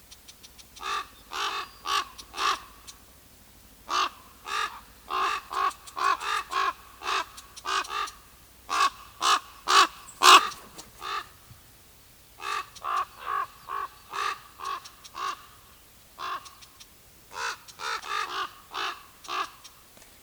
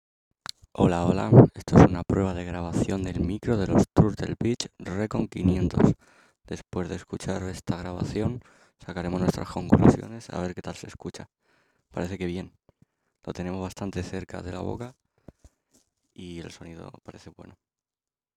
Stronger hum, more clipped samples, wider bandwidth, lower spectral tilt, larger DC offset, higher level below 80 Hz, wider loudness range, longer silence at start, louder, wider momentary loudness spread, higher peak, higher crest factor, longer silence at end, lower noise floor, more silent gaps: neither; neither; first, over 20 kHz vs 12.5 kHz; second, 0.5 dB/octave vs -7.5 dB/octave; neither; second, -62 dBFS vs -46 dBFS; about the same, 14 LU vs 16 LU; second, 0.1 s vs 0.8 s; about the same, -27 LUFS vs -25 LUFS; about the same, 20 LU vs 22 LU; about the same, -2 dBFS vs -2 dBFS; about the same, 28 dB vs 24 dB; second, 0.55 s vs 0.85 s; second, -54 dBFS vs under -90 dBFS; neither